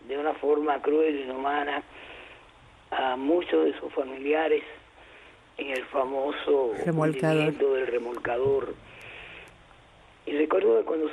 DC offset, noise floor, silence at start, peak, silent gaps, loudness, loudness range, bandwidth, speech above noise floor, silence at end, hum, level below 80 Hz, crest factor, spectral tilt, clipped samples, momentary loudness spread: under 0.1%; -55 dBFS; 0.05 s; -14 dBFS; none; -27 LUFS; 2 LU; 11.5 kHz; 28 dB; 0 s; none; -62 dBFS; 14 dB; -7 dB/octave; under 0.1%; 19 LU